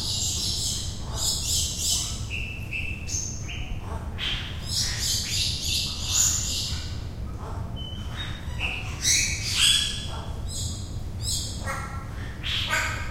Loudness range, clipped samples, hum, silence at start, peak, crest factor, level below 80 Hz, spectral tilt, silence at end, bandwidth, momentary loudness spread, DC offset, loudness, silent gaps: 4 LU; under 0.1%; none; 0 s; -8 dBFS; 20 dB; -36 dBFS; -1.5 dB/octave; 0 s; 16 kHz; 14 LU; under 0.1%; -26 LUFS; none